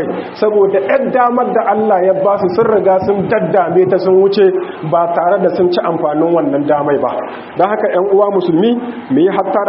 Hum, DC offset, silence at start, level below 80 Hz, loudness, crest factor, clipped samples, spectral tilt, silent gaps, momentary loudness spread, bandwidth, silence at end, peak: none; under 0.1%; 0 s; -56 dBFS; -12 LUFS; 12 dB; under 0.1%; -5.5 dB/octave; none; 5 LU; 5.8 kHz; 0 s; 0 dBFS